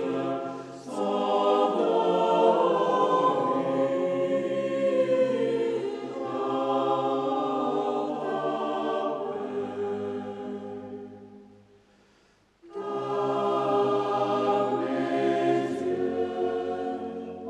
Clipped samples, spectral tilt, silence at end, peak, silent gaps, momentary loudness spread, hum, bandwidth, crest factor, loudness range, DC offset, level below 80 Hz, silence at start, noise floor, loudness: under 0.1%; -6.5 dB/octave; 0 s; -8 dBFS; none; 11 LU; none; 10 kHz; 18 dB; 10 LU; under 0.1%; -74 dBFS; 0 s; -63 dBFS; -27 LUFS